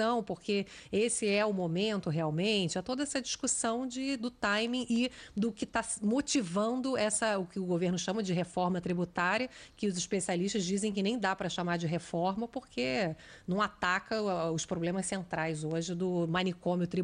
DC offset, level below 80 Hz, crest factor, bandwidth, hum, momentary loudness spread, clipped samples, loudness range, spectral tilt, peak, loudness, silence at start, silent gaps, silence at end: under 0.1%; -64 dBFS; 16 dB; 10.5 kHz; none; 5 LU; under 0.1%; 2 LU; -4.5 dB/octave; -16 dBFS; -32 LUFS; 0 s; none; 0 s